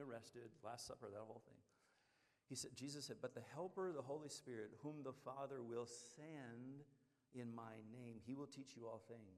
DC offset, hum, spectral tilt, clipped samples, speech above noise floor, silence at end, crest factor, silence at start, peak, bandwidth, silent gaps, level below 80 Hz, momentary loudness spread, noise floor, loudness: under 0.1%; none; -4.5 dB/octave; under 0.1%; 28 dB; 0 s; 20 dB; 0 s; -36 dBFS; 14 kHz; none; under -90 dBFS; 8 LU; -82 dBFS; -54 LUFS